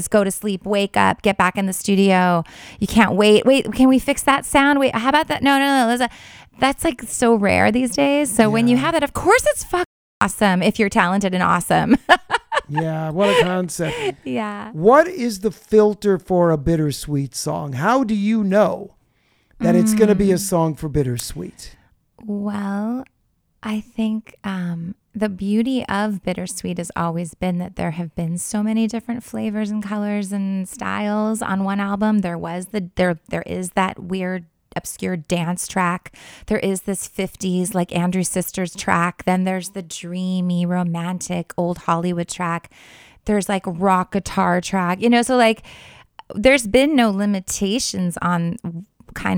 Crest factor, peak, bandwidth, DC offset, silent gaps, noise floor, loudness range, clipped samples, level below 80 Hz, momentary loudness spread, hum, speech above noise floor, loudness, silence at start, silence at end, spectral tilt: 20 dB; 0 dBFS; 19.5 kHz; under 0.1%; 9.86-10.21 s; -61 dBFS; 7 LU; under 0.1%; -44 dBFS; 11 LU; none; 43 dB; -19 LUFS; 0 s; 0 s; -5 dB/octave